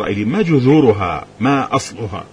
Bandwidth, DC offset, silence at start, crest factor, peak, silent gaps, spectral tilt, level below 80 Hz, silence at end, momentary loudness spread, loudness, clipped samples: 10.5 kHz; under 0.1%; 0 s; 14 dB; -2 dBFS; none; -7 dB/octave; -44 dBFS; 0.05 s; 11 LU; -15 LUFS; under 0.1%